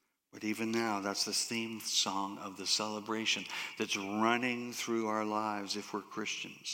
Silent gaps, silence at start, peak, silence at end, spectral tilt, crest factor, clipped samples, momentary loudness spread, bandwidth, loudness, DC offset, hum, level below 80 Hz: none; 0.35 s; -14 dBFS; 0 s; -2 dB/octave; 22 dB; under 0.1%; 8 LU; 17 kHz; -34 LUFS; under 0.1%; none; -88 dBFS